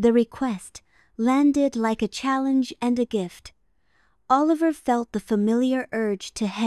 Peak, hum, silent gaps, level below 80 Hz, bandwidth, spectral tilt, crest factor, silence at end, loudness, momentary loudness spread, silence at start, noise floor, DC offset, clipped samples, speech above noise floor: -6 dBFS; none; none; -56 dBFS; 12.5 kHz; -5.5 dB/octave; 16 dB; 0 s; -23 LUFS; 9 LU; 0 s; -67 dBFS; under 0.1%; under 0.1%; 44 dB